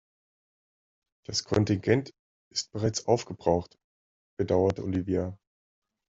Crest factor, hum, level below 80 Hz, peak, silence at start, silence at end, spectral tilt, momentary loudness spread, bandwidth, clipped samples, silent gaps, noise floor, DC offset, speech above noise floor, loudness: 24 dB; none; -58 dBFS; -6 dBFS; 1.3 s; 0.75 s; -5.5 dB/octave; 10 LU; 8 kHz; under 0.1%; 2.19-2.51 s, 3.84-4.37 s; under -90 dBFS; under 0.1%; over 63 dB; -28 LUFS